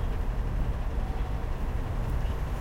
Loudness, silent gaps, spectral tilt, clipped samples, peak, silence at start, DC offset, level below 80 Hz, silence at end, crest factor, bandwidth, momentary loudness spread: -33 LUFS; none; -7.5 dB/octave; under 0.1%; -18 dBFS; 0 s; under 0.1%; -30 dBFS; 0 s; 12 dB; 15.5 kHz; 2 LU